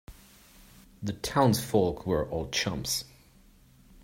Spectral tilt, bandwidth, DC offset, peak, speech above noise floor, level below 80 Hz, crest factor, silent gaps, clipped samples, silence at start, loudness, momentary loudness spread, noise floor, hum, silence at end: -4.5 dB/octave; 16.5 kHz; under 0.1%; -10 dBFS; 30 dB; -50 dBFS; 22 dB; none; under 0.1%; 0.1 s; -29 LUFS; 12 LU; -58 dBFS; none; 1 s